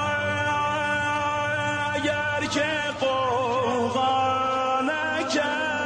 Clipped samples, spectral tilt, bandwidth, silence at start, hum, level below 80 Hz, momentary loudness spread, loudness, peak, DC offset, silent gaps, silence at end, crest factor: under 0.1%; -4 dB/octave; 11 kHz; 0 s; none; -56 dBFS; 2 LU; -24 LUFS; -12 dBFS; under 0.1%; none; 0 s; 12 dB